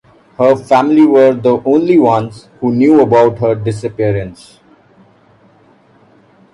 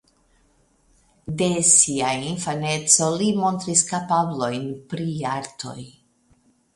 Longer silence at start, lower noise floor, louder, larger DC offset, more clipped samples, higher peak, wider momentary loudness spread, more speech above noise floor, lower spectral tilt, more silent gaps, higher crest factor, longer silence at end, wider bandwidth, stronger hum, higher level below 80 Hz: second, 0.4 s vs 1.25 s; second, -47 dBFS vs -61 dBFS; first, -11 LUFS vs -20 LUFS; neither; neither; about the same, 0 dBFS vs -2 dBFS; second, 11 LU vs 19 LU; about the same, 37 dB vs 39 dB; first, -8 dB/octave vs -3 dB/octave; neither; second, 12 dB vs 22 dB; first, 2.2 s vs 0.85 s; about the same, 11 kHz vs 11.5 kHz; neither; first, -48 dBFS vs -58 dBFS